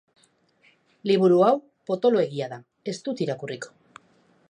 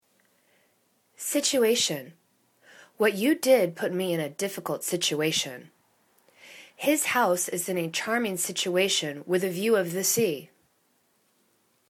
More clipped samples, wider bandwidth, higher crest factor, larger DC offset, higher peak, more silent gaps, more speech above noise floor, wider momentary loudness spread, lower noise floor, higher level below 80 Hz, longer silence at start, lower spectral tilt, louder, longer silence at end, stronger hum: neither; second, 9.8 kHz vs 19 kHz; about the same, 18 dB vs 20 dB; neither; about the same, -6 dBFS vs -8 dBFS; neither; about the same, 40 dB vs 43 dB; first, 17 LU vs 9 LU; second, -63 dBFS vs -69 dBFS; about the same, -78 dBFS vs -76 dBFS; second, 1.05 s vs 1.2 s; first, -6.5 dB/octave vs -3 dB/octave; about the same, -24 LUFS vs -26 LUFS; second, 0.85 s vs 1.45 s; neither